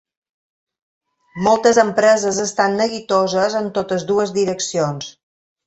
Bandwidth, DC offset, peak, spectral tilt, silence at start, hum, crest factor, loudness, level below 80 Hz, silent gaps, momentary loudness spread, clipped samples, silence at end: 8.2 kHz; under 0.1%; -2 dBFS; -4 dB/octave; 1.35 s; none; 18 dB; -17 LUFS; -58 dBFS; none; 8 LU; under 0.1%; 0.55 s